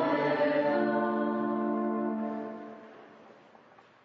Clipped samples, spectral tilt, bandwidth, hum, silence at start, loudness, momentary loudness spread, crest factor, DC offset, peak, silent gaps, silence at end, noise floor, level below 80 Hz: under 0.1%; -8.5 dB/octave; 6 kHz; none; 0 s; -30 LUFS; 18 LU; 16 dB; under 0.1%; -16 dBFS; none; 0.7 s; -57 dBFS; -84 dBFS